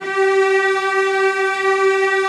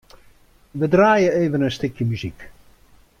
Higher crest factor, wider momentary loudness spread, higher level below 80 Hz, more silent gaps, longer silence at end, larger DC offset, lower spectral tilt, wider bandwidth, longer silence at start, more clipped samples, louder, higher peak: second, 10 dB vs 18 dB; second, 2 LU vs 15 LU; second, -74 dBFS vs -50 dBFS; neither; second, 0 s vs 0.7 s; neither; second, -2 dB/octave vs -7 dB/octave; second, 11.5 kHz vs 14.5 kHz; second, 0 s vs 0.75 s; neither; first, -16 LUFS vs -19 LUFS; about the same, -6 dBFS vs -4 dBFS